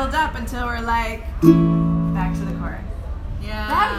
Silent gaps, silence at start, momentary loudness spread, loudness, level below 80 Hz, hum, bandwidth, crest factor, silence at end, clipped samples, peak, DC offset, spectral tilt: none; 0 s; 16 LU; -20 LUFS; -28 dBFS; none; 15 kHz; 20 dB; 0 s; under 0.1%; 0 dBFS; under 0.1%; -7 dB/octave